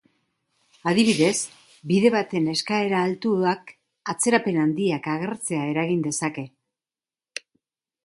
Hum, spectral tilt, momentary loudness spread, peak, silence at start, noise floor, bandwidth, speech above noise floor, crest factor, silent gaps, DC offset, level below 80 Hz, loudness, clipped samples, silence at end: none; -4.5 dB/octave; 17 LU; -4 dBFS; 0.85 s; under -90 dBFS; 11.5 kHz; over 68 dB; 20 dB; none; under 0.1%; -68 dBFS; -23 LUFS; under 0.1%; 1.55 s